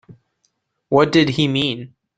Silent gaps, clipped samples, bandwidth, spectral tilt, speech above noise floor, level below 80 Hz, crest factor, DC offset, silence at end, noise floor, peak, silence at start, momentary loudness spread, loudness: none; under 0.1%; 9.2 kHz; -6 dB/octave; 53 dB; -54 dBFS; 18 dB; under 0.1%; 0.3 s; -69 dBFS; -2 dBFS; 0.1 s; 8 LU; -17 LUFS